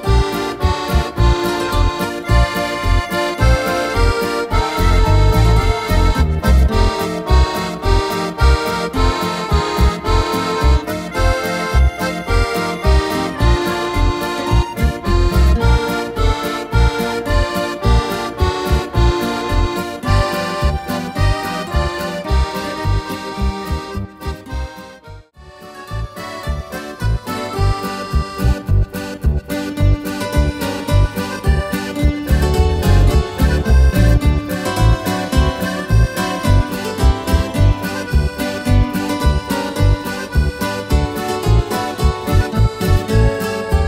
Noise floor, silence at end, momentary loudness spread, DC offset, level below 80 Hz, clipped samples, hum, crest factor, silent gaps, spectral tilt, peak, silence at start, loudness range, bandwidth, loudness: -39 dBFS; 0 s; 7 LU; under 0.1%; -18 dBFS; under 0.1%; none; 14 dB; none; -6 dB/octave; 0 dBFS; 0 s; 6 LU; 16.5 kHz; -17 LUFS